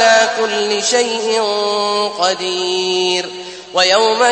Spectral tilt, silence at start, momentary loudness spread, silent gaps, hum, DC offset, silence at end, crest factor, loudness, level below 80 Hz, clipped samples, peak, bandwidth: -1 dB/octave; 0 s; 6 LU; none; none; under 0.1%; 0 s; 14 dB; -15 LUFS; -62 dBFS; under 0.1%; 0 dBFS; 8.8 kHz